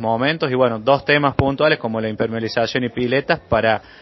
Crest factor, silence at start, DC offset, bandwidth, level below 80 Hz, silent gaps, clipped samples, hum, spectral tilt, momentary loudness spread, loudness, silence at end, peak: 18 dB; 0 s; under 0.1%; 6 kHz; -42 dBFS; none; under 0.1%; none; -7 dB/octave; 6 LU; -18 LUFS; 0.2 s; 0 dBFS